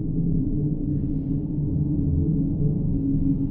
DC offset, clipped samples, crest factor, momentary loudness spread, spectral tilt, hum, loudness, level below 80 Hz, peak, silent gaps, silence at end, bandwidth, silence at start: under 0.1%; under 0.1%; 12 dB; 3 LU; -16 dB/octave; none; -25 LUFS; -30 dBFS; -12 dBFS; none; 0 s; 1.2 kHz; 0 s